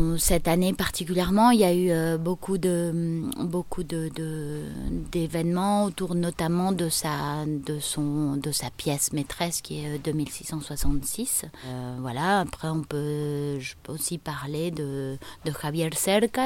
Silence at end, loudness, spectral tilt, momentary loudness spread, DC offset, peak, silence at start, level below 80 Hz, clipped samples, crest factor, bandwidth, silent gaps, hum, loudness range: 0 s; -27 LUFS; -5 dB/octave; 10 LU; under 0.1%; -8 dBFS; 0 s; -40 dBFS; under 0.1%; 18 dB; 17 kHz; none; none; 5 LU